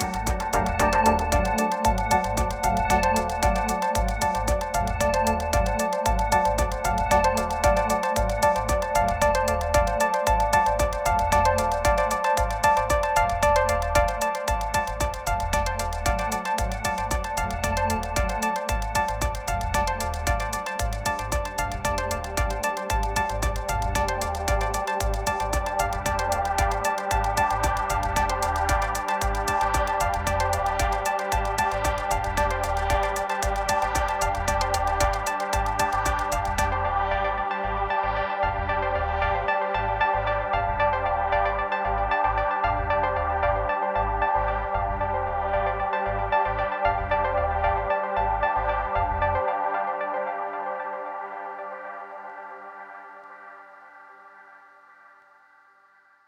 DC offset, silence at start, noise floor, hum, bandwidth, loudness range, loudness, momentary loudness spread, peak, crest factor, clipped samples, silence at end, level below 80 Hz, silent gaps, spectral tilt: under 0.1%; 0 s; -58 dBFS; 50 Hz at -45 dBFS; 20 kHz; 5 LU; -25 LUFS; 6 LU; -6 dBFS; 18 dB; under 0.1%; 1.7 s; -32 dBFS; none; -4 dB/octave